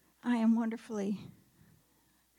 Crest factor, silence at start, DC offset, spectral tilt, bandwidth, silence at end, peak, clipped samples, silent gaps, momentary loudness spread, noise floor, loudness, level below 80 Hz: 14 dB; 0.25 s; under 0.1%; -7 dB/octave; 11 kHz; 1.1 s; -20 dBFS; under 0.1%; none; 12 LU; -70 dBFS; -33 LUFS; -80 dBFS